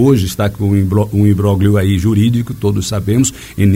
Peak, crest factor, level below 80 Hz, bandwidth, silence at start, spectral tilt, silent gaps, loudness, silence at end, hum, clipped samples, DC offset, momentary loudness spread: 0 dBFS; 12 dB; -36 dBFS; 16.5 kHz; 0 s; -6.5 dB/octave; none; -14 LUFS; 0 s; none; under 0.1%; under 0.1%; 5 LU